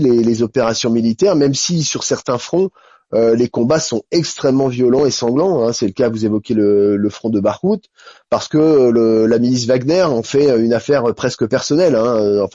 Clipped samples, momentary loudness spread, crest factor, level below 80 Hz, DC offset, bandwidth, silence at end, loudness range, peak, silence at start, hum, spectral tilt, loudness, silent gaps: under 0.1%; 6 LU; 10 dB; -54 dBFS; under 0.1%; 7.8 kHz; 0.05 s; 2 LU; -4 dBFS; 0 s; none; -5.5 dB/octave; -15 LUFS; none